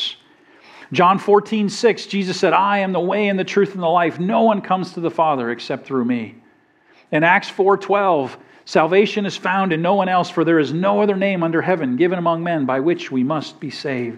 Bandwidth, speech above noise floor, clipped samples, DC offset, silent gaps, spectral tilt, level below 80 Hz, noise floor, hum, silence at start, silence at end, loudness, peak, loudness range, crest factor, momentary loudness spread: 10.5 kHz; 37 dB; under 0.1%; under 0.1%; none; -6 dB/octave; -76 dBFS; -54 dBFS; none; 0 s; 0 s; -18 LUFS; 0 dBFS; 2 LU; 18 dB; 8 LU